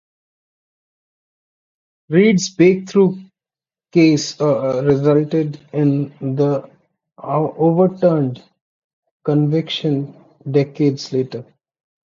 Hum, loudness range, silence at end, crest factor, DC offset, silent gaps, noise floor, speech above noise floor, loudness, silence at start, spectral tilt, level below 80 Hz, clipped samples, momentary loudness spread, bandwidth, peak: none; 4 LU; 0.65 s; 16 dB; under 0.1%; 8.61-9.03 s, 9.11-9.20 s; under -90 dBFS; over 74 dB; -17 LUFS; 2.1 s; -6.5 dB/octave; -60 dBFS; under 0.1%; 11 LU; 7.6 kHz; -2 dBFS